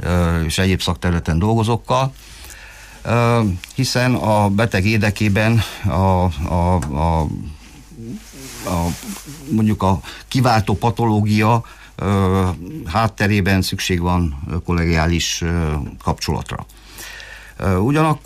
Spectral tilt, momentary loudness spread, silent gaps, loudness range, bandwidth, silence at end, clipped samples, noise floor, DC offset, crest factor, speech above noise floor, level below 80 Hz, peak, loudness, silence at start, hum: -6 dB/octave; 17 LU; none; 4 LU; 15.5 kHz; 0.05 s; under 0.1%; -38 dBFS; under 0.1%; 12 dB; 21 dB; -32 dBFS; -6 dBFS; -18 LUFS; 0 s; none